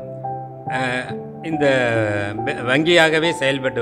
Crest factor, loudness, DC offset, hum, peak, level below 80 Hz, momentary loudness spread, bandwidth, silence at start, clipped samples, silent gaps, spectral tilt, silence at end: 20 dB; -18 LUFS; under 0.1%; none; 0 dBFS; -54 dBFS; 16 LU; 14 kHz; 0 s; under 0.1%; none; -5 dB/octave; 0 s